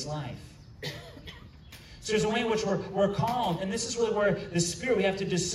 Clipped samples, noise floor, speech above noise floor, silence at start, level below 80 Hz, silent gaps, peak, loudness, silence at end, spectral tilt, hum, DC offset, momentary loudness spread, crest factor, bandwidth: under 0.1%; -49 dBFS; 20 dB; 0 s; -54 dBFS; none; -14 dBFS; -29 LUFS; 0 s; -4.5 dB/octave; none; under 0.1%; 19 LU; 16 dB; 15 kHz